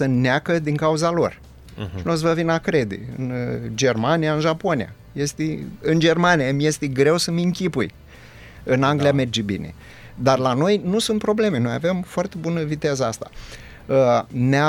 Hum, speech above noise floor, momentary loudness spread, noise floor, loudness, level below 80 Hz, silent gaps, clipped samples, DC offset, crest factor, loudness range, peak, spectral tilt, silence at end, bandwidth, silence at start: none; 23 dB; 11 LU; -43 dBFS; -21 LUFS; -48 dBFS; none; under 0.1%; under 0.1%; 18 dB; 2 LU; -2 dBFS; -5.5 dB/octave; 0 s; 17 kHz; 0 s